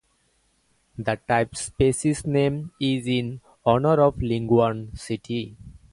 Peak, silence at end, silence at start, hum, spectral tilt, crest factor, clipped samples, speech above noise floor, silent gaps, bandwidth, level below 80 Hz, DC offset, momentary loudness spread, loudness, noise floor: -4 dBFS; 0.15 s; 1 s; none; -6 dB/octave; 20 dB; under 0.1%; 44 dB; none; 11.5 kHz; -46 dBFS; under 0.1%; 12 LU; -24 LUFS; -67 dBFS